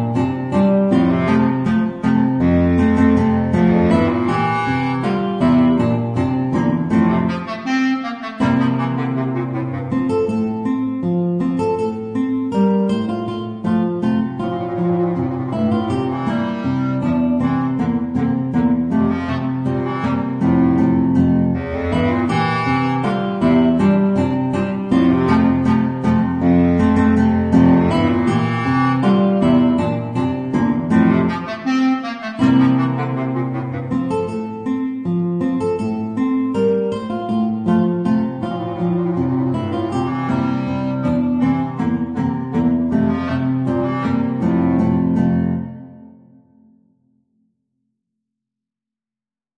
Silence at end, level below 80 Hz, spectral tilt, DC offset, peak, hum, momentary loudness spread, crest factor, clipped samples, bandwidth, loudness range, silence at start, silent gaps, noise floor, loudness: 3.5 s; -42 dBFS; -8.5 dB/octave; under 0.1%; 0 dBFS; none; 7 LU; 16 dB; under 0.1%; 9.2 kHz; 5 LU; 0 s; none; under -90 dBFS; -18 LUFS